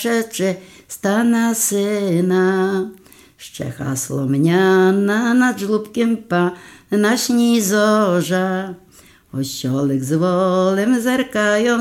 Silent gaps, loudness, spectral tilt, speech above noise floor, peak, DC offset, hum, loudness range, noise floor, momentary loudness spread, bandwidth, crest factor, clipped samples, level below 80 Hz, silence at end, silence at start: none; -17 LUFS; -5 dB/octave; 27 dB; -2 dBFS; under 0.1%; none; 2 LU; -44 dBFS; 10 LU; 16.5 kHz; 14 dB; under 0.1%; -58 dBFS; 0 s; 0 s